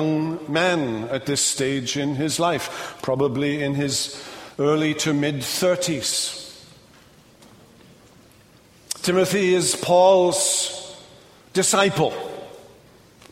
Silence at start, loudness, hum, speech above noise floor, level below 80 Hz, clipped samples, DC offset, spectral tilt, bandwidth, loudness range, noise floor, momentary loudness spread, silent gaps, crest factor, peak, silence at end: 0 s; -21 LUFS; none; 31 dB; -60 dBFS; under 0.1%; under 0.1%; -3.5 dB/octave; 16 kHz; 7 LU; -52 dBFS; 15 LU; none; 20 dB; -4 dBFS; 0.7 s